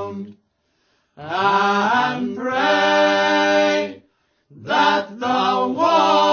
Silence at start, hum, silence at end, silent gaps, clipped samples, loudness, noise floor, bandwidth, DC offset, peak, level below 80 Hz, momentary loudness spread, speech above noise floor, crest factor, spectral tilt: 0 s; none; 0 s; none; under 0.1%; -18 LUFS; -67 dBFS; 7 kHz; under 0.1%; -4 dBFS; -64 dBFS; 15 LU; 47 dB; 16 dB; -4 dB/octave